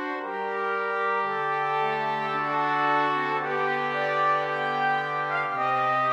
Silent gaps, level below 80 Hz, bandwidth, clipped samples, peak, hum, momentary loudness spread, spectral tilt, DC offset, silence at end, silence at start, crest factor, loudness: none; -84 dBFS; 9.8 kHz; under 0.1%; -12 dBFS; none; 4 LU; -5.5 dB/octave; under 0.1%; 0 s; 0 s; 14 dB; -26 LUFS